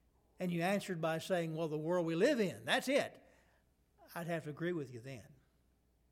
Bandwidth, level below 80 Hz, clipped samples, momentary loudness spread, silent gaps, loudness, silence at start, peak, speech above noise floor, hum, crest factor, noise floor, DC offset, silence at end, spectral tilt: 16.5 kHz; -76 dBFS; under 0.1%; 14 LU; none; -37 LUFS; 0.4 s; -18 dBFS; 37 dB; none; 20 dB; -74 dBFS; under 0.1%; 0.8 s; -5.5 dB/octave